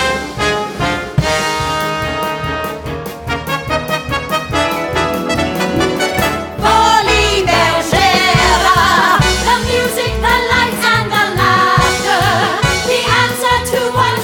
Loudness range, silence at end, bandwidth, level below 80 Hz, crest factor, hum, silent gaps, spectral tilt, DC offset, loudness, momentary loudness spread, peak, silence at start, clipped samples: 7 LU; 0 s; 19 kHz; -28 dBFS; 14 dB; none; none; -3.5 dB/octave; under 0.1%; -13 LUFS; 8 LU; 0 dBFS; 0 s; under 0.1%